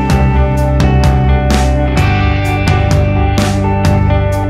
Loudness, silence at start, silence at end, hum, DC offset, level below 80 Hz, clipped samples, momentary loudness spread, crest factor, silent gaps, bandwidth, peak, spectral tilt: -12 LUFS; 0 s; 0 s; none; under 0.1%; -14 dBFS; under 0.1%; 2 LU; 10 dB; none; 14 kHz; 0 dBFS; -6.5 dB/octave